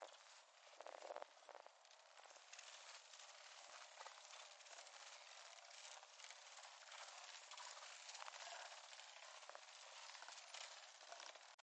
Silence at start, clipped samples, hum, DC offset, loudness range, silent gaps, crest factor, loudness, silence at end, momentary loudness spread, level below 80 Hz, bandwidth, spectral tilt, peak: 0 s; under 0.1%; none; under 0.1%; 3 LU; 11.54-11.58 s; 28 dB; -58 LUFS; 0 s; 8 LU; under -90 dBFS; 10 kHz; 4 dB/octave; -34 dBFS